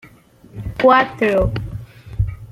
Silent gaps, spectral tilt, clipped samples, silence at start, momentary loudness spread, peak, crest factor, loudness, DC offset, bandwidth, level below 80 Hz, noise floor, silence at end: none; -7.5 dB/octave; under 0.1%; 0.55 s; 20 LU; -2 dBFS; 18 dB; -17 LUFS; under 0.1%; 13.5 kHz; -32 dBFS; -46 dBFS; 0 s